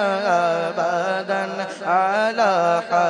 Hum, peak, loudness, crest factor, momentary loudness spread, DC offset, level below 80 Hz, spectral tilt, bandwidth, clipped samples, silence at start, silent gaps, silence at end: none; -6 dBFS; -20 LUFS; 14 dB; 6 LU; under 0.1%; -76 dBFS; -4.5 dB/octave; 10.5 kHz; under 0.1%; 0 s; none; 0 s